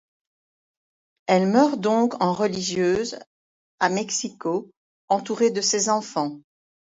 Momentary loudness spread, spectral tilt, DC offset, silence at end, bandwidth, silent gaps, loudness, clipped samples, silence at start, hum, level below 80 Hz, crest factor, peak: 9 LU; -4 dB/octave; under 0.1%; 0.55 s; 8 kHz; 3.27-3.78 s, 4.77-5.08 s; -23 LUFS; under 0.1%; 1.3 s; none; -66 dBFS; 20 dB; -4 dBFS